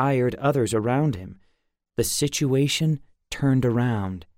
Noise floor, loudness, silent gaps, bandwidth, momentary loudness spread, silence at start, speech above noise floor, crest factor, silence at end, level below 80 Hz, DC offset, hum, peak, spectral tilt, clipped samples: -69 dBFS; -23 LUFS; none; 16.5 kHz; 11 LU; 0 s; 47 dB; 14 dB; 0.15 s; -50 dBFS; under 0.1%; none; -10 dBFS; -5.5 dB/octave; under 0.1%